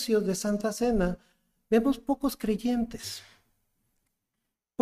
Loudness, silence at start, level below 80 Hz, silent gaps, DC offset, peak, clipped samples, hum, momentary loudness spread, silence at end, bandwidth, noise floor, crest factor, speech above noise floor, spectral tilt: -29 LUFS; 0 s; -48 dBFS; none; under 0.1%; -12 dBFS; under 0.1%; none; 13 LU; 1.6 s; 15.5 kHz; -84 dBFS; 18 dB; 56 dB; -5.5 dB/octave